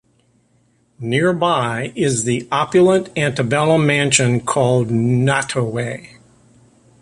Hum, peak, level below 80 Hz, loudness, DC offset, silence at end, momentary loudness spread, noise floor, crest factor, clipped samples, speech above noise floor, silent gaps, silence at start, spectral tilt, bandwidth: none; 0 dBFS; -52 dBFS; -17 LUFS; under 0.1%; 1 s; 8 LU; -59 dBFS; 18 dB; under 0.1%; 42 dB; none; 1 s; -5 dB/octave; 11.5 kHz